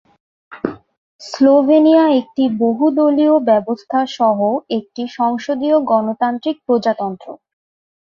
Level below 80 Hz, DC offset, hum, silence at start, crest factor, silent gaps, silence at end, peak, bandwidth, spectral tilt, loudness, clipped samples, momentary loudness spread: -62 dBFS; under 0.1%; none; 0.5 s; 14 dB; 0.97-1.19 s; 0.65 s; -2 dBFS; 7.4 kHz; -6.5 dB/octave; -15 LUFS; under 0.1%; 15 LU